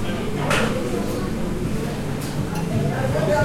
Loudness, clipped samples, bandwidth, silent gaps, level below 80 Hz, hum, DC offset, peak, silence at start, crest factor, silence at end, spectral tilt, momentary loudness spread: -24 LUFS; under 0.1%; 16.5 kHz; none; -36 dBFS; none; under 0.1%; -6 dBFS; 0 s; 16 dB; 0 s; -6 dB/octave; 6 LU